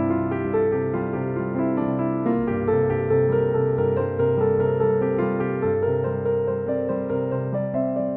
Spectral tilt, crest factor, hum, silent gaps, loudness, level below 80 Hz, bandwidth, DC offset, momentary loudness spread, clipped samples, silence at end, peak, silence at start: -13 dB/octave; 12 dB; none; none; -23 LUFS; -52 dBFS; 3.5 kHz; under 0.1%; 5 LU; under 0.1%; 0 s; -10 dBFS; 0 s